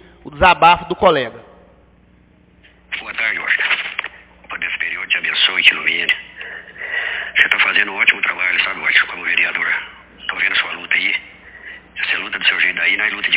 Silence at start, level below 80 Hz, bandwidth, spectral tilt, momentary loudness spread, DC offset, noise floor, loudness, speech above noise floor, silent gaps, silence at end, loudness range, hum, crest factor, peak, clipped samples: 0.25 s; -46 dBFS; 4 kHz; -5.5 dB/octave; 16 LU; under 0.1%; -50 dBFS; -15 LUFS; 34 dB; none; 0 s; 6 LU; none; 18 dB; 0 dBFS; under 0.1%